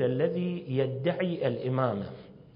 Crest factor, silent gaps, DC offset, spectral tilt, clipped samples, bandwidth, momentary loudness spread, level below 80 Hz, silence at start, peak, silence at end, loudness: 18 dB; none; under 0.1%; -11.5 dB/octave; under 0.1%; 5.4 kHz; 7 LU; -64 dBFS; 0 s; -12 dBFS; 0.05 s; -30 LUFS